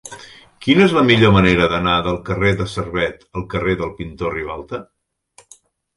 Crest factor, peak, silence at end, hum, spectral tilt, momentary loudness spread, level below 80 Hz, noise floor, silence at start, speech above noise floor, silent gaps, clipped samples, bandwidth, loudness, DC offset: 18 dB; 0 dBFS; 1.15 s; none; -6 dB/octave; 17 LU; -38 dBFS; -52 dBFS; 0.05 s; 36 dB; none; under 0.1%; 11.5 kHz; -17 LUFS; under 0.1%